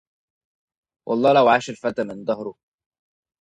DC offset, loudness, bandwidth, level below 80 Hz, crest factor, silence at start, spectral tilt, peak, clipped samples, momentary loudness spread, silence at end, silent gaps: under 0.1%; -20 LUFS; 9.4 kHz; -64 dBFS; 20 dB; 1.05 s; -5.5 dB/octave; -4 dBFS; under 0.1%; 15 LU; 0.9 s; none